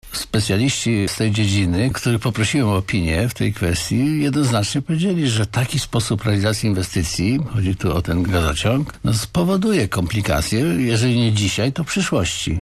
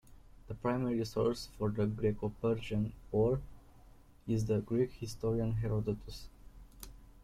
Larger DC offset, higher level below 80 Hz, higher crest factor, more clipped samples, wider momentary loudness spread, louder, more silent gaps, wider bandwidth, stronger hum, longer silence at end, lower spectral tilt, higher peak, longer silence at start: neither; first, -36 dBFS vs -52 dBFS; about the same, 12 dB vs 16 dB; neither; second, 3 LU vs 17 LU; first, -19 LUFS vs -35 LUFS; neither; about the same, 14 kHz vs 15 kHz; neither; about the same, 0.05 s vs 0 s; second, -5 dB/octave vs -7.5 dB/octave; first, -6 dBFS vs -18 dBFS; about the same, 0.05 s vs 0.1 s